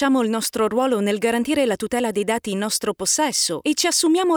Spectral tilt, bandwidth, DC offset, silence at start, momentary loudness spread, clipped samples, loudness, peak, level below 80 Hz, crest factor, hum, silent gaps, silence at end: -2.5 dB/octave; over 20 kHz; under 0.1%; 0 s; 5 LU; under 0.1%; -20 LUFS; -8 dBFS; -58 dBFS; 14 dB; none; none; 0 s